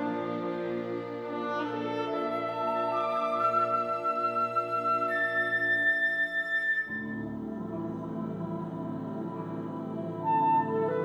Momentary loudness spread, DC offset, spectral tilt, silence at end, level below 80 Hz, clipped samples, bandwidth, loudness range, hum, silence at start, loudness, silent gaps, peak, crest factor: 11 LU; under 0.1%; -7 dB/octave; 0 s; -68 dBFS; under 0.1%; over 20 kHz; 7 LU; none; 0 s; -30 LUFS; none; -16 dBFS; 14 dB